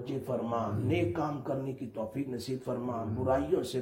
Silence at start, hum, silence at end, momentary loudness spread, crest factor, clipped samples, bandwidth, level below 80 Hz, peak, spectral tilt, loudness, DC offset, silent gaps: 0 s; none; 0 s; 7 LU; 16 dB; under 0.1%; 16.5 kHz; -58 dBFS; -16 dBFS; -7.5 dB/octave; -33 LUFS; under 0.1%; none